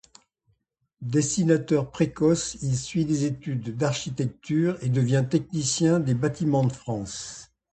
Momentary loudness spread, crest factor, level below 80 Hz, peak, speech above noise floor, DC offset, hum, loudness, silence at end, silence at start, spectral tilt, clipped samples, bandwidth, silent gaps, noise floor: 9 LU; 18 dB; -56 dBFS; -6 dBFS; 49 dB; under 0.1%; none; -25 LUFS; 0.3 s; 1 s; -6 dB/octave; under 0.1%; 9.2 kHz; none; -73 dBFS